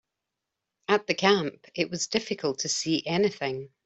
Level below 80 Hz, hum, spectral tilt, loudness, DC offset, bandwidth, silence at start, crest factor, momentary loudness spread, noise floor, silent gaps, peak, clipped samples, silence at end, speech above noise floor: -68 dBFS; none; -3.5 dB/octave; -27 LUFS; under 0.1%; 8.2 kHz; 0.9 s; 22 dB; 10 LU; -86 dBFS; none; -6 dBFS; under 0.1%; 0.2 s; 58 dB